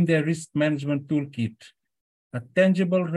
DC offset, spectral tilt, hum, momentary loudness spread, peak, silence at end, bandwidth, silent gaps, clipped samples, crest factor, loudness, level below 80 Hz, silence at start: under 0.1%; -7 dB/octave; none; 11 LU; -8 dBFS; 0 s; 11.5 kHz; 2.01-2.30 s; under 0.1%; 18 dB; -24 LUFS; -70 dBFS; 0 s